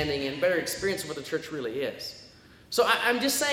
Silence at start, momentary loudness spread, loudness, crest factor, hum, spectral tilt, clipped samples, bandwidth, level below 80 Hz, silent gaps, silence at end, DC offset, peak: 0 s; 11 LU; -27 LUFS; 20 dB; none; -2.5 dB/octave; under 0.1%; 17 kHz; -58 dBFS; none; 0 s; under 0.1%; -8 dBFS